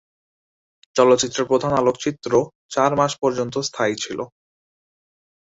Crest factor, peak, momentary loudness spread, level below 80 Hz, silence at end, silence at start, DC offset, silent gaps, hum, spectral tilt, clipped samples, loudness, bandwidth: 20 dB; -2 dBFS; 10 LU; -58 dBFS; 1.25 s; 0.95 s; under 0.1%; 2.55-2.69 s; none; -4 dB/octave; under 0.1%; -20 LUFS; 8 kHz